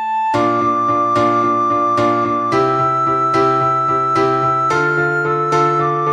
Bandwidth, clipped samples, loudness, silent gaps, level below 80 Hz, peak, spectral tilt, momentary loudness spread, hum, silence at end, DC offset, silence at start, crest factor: 10.5 kHz; under 0.1%; -15 LUFS; none; -52 dBFS; -2 dBFS; -6.5 dB/octave; 2 LU; none; 0 s; under 0.1%; 0 s; 12 dB